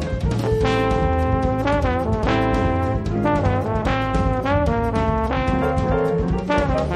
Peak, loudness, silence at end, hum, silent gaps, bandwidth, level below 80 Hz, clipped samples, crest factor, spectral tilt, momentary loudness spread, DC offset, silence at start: -4 dBFS; -20 LUFS; 0 s; none; none; 11.5 kHz; -28 dBFS; under 0.1%; 14 dB; -7.5 dB/octave; 2 LU; under 0.1%; 0 s